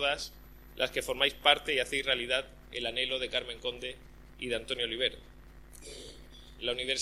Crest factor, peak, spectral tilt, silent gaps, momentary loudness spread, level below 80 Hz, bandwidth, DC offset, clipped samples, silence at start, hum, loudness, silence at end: 26 dB; -8 dBFS; -2 dB/octave; none; 21 LU; -54 dBFS; 15.5 kHz; under 0.1%; under 0.1%; 0 s; none; -31 LUFS; 0 s